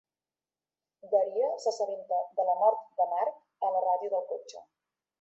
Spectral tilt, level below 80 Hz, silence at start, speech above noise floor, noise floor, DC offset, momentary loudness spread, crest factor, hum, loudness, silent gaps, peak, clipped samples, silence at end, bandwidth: -2.5 dB/octave; -88 dBFS; 1.05 s; over 61 dB; under -90 dBFS; under 0.1%; 8 LU; 18 dB; none; -30 LUFS; none; -12 dBFS; under 0.1%; 0.6 s; 8.2 kHz